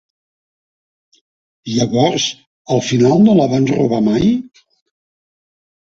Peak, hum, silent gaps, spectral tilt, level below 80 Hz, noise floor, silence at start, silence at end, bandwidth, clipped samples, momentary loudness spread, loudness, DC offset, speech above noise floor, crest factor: -2 dBFS; none; 2.47-2.65 s; -6 dB/octave; -50 dBFS; under -90 dBFS; 1.65 s; 1.4 s; 7.8 kHz; under 0.1%; 11 LU; -14 LUFS; under 0.1%; over 77 dB; 16 dB